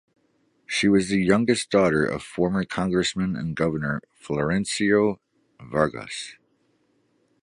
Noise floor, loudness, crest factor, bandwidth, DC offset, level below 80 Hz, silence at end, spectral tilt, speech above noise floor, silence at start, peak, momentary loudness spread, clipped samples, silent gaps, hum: -67 dBFS; -24 LUFS; 20 dB; 11.5 kHz; under 0.1%; -52 dBFS; 1.1 s; -5 dB/octave; 44 dB; 0.7 s; -4 dBFS; 11 LU; under 0.1%; none; none